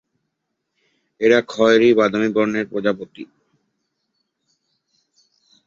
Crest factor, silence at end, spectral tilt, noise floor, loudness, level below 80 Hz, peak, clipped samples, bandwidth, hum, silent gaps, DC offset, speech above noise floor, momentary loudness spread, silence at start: 18 dB; 2.45 s; -5.5 dB/octave; -76 dBFS; -17 LUFS; -64 dBFS; -2 dBFS; under 0.1%; 7.6 kHz; none; none; under 0.1%; 60 dB; 14 LU; 1.2 s